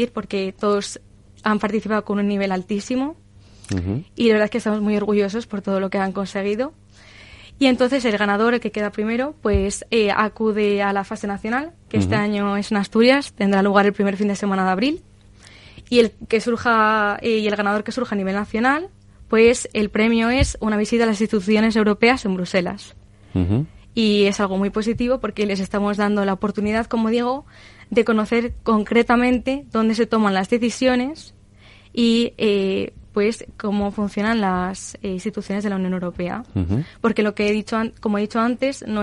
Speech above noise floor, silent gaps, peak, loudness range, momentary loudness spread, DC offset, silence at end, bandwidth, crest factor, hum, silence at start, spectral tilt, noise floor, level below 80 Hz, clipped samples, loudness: 28 dB; none; -2 dBFS; 4 LU; 9 LU; under 0.1%; 0 s; 11.5 kHz; 18 dB; none; 0 s; -5.5 dB/octave; -48 dBFS; -42 dBFS; under 0.1%; -20 LUFS